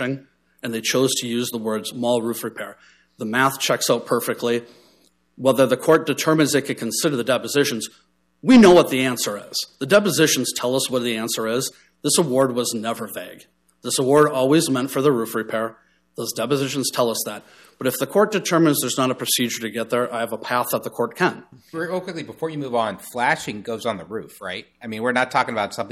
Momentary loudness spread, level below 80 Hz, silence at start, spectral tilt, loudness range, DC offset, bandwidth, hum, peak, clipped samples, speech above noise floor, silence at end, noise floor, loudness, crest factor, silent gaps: 13 LU; -62 dBFS; 0 s; -4 dB/octave; 7 LU; under 0.1%; 15 kHz; none; -4 dBFS; under 0.1%; 39 dB; 0 s; -59 dBFS; -20 LUFS; 18 dB; none